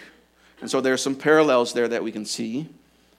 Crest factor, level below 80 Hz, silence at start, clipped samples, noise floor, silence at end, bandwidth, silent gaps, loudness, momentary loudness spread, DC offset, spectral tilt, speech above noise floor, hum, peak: 20 dB; -70 dBFS; 0 s; under 0.1%; -55 dBFS; 0.5 s; 15 kHz; none; -22 LUFS; 15 LU; under 0.1%; -4 dB/octave; 34 dB; none; -4 dBFS